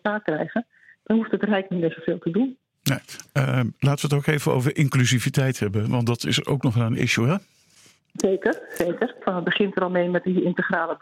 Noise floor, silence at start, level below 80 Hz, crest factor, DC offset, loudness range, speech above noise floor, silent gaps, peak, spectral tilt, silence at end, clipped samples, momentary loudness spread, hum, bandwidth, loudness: -56 dBFS; 0.05 s; -58 dBFS; 20 dB; under 0.1%; 3 LU; 34 dB; none; -4 dBFS; -5.5 dB/octave; 0.05 s; under 0.1%; 6 LU; none; 16.5 kHz; -23 LUFS